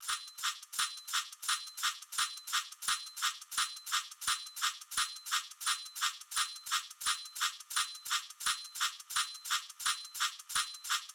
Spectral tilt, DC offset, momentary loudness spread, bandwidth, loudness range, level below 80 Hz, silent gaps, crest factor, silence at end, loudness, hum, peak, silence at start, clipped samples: 5 dB/octave; under 0.1%; 2 LU; over 20 kHz; 1 LU; -76 dBFS; none; 20 dB; 0 s; -35 LUFS; none; -18 dBFS; 0 s; under 0.1%